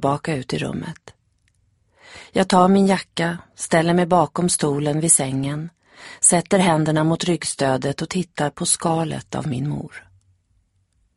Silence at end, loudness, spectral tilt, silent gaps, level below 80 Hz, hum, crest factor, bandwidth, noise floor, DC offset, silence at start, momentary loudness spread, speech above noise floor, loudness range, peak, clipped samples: 1.15 s; -19 LUFS; -4.5 dB/octave; none; -54 dBFS; none; 20 dB; 11.5 kHz; -65 dBFS; under 0.1%; 0 s; 12 LU; 45 dB; 5 LU; -2 dBFS; under 0.1%